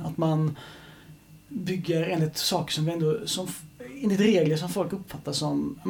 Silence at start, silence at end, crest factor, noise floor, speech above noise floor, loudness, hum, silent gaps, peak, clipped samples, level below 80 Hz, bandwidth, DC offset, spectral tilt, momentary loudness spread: 0 s; 0 s; 18 dB; -50 dBFS; 24 dB; -27 LUFS; none; none; -10 dBFS; under 0.1%; -60 dBFS; 18.5 kHz; under 0.1%; -5.5 dB/octave; 16 LU